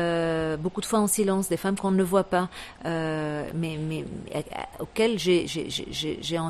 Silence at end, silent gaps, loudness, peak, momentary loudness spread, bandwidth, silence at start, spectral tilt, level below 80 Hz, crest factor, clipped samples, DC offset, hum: 0 s; none; -27 LUFS; -8 dBFS; 10 LU; 14 kHz; 0 s; -4.5 dB/octave; -52 dBFS; 18 dB; under 0.1%; under 0.1%; none